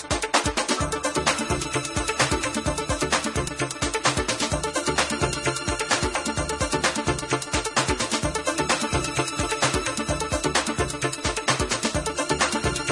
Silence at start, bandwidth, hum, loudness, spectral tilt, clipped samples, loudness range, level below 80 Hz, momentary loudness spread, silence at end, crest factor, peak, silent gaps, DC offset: 0 s; 11.5 kHz; none; -24 LUFS; -3 dB/octave; under 0.1%; 0 LU; -38 dBFS; 4 LU; 0 s; 20 dB; -4 dBFS; none; under 0.1%